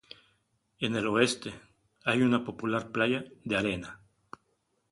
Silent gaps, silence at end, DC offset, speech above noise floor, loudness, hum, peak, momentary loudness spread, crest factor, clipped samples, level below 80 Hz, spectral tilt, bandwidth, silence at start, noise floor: none; 0.95 s; under 0.1%; 46 dB; -30 LUFS; none; -10 dBFS; 12 LU; 22 dB; under 0.1%; -62 dBFS; -5 dB/octave; 11.5 kHz; 0.8 s; -75 dBFS